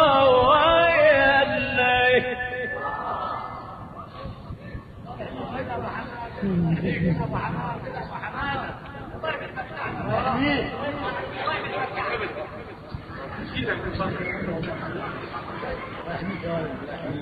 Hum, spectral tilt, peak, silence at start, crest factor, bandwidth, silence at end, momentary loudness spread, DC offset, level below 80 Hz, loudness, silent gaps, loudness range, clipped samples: none; -8 dB/octave; -6 dBFS; 0 s; 20 dB; 5 kHz; 0 s; 20 LU; under 0.1%; -46 dBFS; -24 LUFS; none; 11 LU; under 0.1%